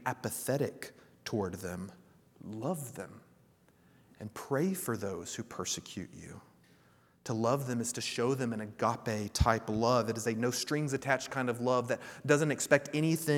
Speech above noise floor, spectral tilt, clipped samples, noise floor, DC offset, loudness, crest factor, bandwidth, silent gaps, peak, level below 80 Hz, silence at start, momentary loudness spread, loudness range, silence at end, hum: 32 dB; -4.5 dB/octave; under 0.1%; -65 dBFS; under 0.1%; -33 LUFS; 26 dB; 18.5 kHz; none; -8 dBFS; -52 dBFS; 0 s; 17 LU; 9 LU; 0 s; none